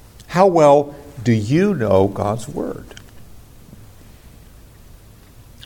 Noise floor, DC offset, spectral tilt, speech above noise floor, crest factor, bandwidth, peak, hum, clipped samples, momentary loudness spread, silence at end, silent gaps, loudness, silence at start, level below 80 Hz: -44 dBFS; under 0.1%; -7 dB/octave; 28 dB; 18 dB; 17 kHz; -2 dBFS; none; under 0.1%; 15 LU; 1.9 s; none; -17 LUFS; 0.2 s; -46 dBFS